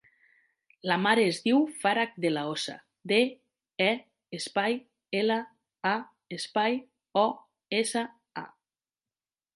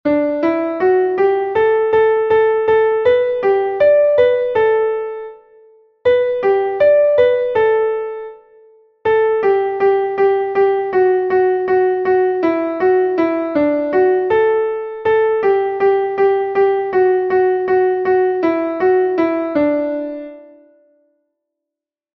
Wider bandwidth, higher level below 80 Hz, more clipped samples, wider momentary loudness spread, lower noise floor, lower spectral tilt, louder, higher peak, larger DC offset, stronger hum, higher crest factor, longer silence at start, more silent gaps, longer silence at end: first, 11.5 kHz vs 5 kHz; second, -80 dBFS vs -54 dBFS; neither; first, 18 LU vs 6 LU; first, under -90 dBFS vs -85 dBFS; second, -4 dB/octave vs -7.5 dB/octave; second, -29 LUFS vs -15 LUFS; second, -8 dBFS vs -2 dBFS; neither; neither; first, 22 dB vs 14 dB; first, 0.85 s vs 0.05 s; neither; second, 1.1 s vs 1.7 s